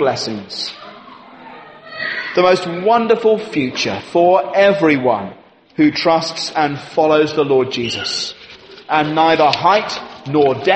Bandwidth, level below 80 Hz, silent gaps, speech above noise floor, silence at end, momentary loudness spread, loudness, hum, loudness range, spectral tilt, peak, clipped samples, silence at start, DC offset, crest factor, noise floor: 8.8 kHz; -58 dBFS; none; 24 dB; 0 s; 12 LU; -16 LUFS; none; 3 LU; -4.5 dB/octave; 0 dBFS; under 0.1%; 0 s; under 0.1%; 16 dB; -39 dBFS